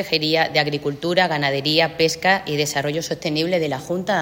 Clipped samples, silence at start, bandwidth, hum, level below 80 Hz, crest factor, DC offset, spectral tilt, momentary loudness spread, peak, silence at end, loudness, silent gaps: under 0.1%; 0 s; 16.5 kHz; none; -56 dBFS; 18 dB; under 0.1%; -4 dB/octave; 6 LU; -2 dBFS; 0 s; -20 LUFS; none